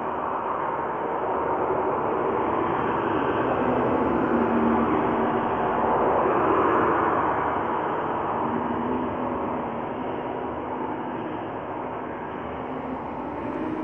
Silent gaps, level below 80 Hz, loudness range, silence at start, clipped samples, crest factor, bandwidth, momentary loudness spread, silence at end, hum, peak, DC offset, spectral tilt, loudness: none; -50 dBFS; 9 LU; 0 s; under 0.1%; 16 dB; 6.8 kHz; 10 LU; 0 s; none; -8 dBFS; under 0.1%; -9 dB/octave; -25 LUFS